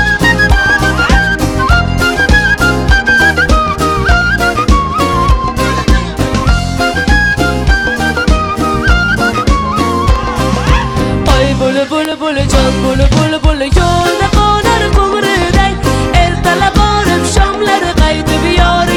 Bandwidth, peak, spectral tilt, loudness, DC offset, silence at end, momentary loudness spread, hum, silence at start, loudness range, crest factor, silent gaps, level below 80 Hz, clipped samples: 16 kHz; 0 dBFS; -5 dB/octave; -10 LUFS; under 0.1%; 0 s; 4 LU; none; 0 s; 2 LU; 10 dB; none; -16 dBFS; 0.3%